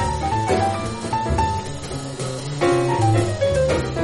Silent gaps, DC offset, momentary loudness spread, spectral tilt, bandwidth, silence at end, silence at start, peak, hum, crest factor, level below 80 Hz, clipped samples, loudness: none; under 0.1%; 9 LU; -6 dB/octave; 11.5 kHz; 0 s; 0 s; -6 dBFS; none; 16 dB; -34 dBFS; under 0.1%; -21 LUFS